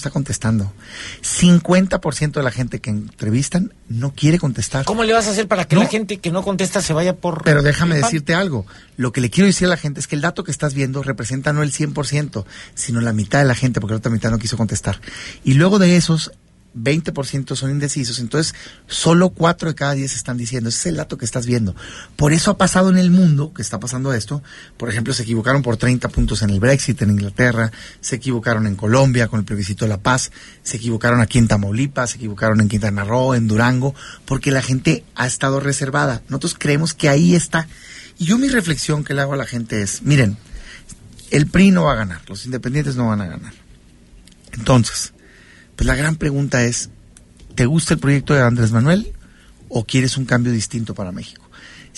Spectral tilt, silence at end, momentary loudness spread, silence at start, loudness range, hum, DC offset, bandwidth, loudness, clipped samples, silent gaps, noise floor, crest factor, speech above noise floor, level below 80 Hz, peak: -5.5 dB/octave; 0.15 s; 11 LU; 0 s; 3 LU; none; under 0.1%; 11.5 kHz; -18 LUFS; under 0.1%; none; -46 dBFS; 16 dB; 29 dB; -36 dBFS; -2 dBFS